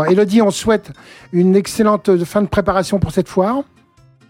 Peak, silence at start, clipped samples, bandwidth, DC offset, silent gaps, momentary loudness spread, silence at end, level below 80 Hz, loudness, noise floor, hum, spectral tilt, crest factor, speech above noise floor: -2 dBFS; 0 s; under 0.1%; 16 kHz; under 0.1%; none; 6 LU; 0.65 s; -42 dBFS; -15 LUFS; -50 dBFS; none; -6.5 dB/octave; 12 dB; 35 dB